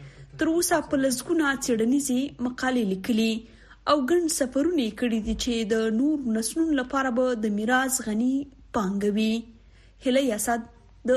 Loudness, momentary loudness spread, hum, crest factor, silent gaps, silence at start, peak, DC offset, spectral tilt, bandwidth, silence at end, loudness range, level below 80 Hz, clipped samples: -25 LUFS; 6 LU; none; 16 dB; none; 0 s; -8 dBFS; under 0.1%; -4 dB/octave; 13 kHz; 0 s; 1 LU; -50 dBFS; under 0.1%